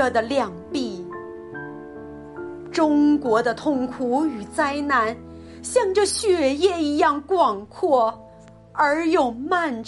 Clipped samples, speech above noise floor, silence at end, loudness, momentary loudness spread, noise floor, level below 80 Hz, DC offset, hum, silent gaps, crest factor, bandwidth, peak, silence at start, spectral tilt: under 0.1%; 25 dB; 0 s; -21 LUFS; 17 LU; -46 dBFS; -54 dBFS; under 0.1%; none; none; 16 dB; 11.5 kHz; -6 dBFS; 0 s; -4 dB/octave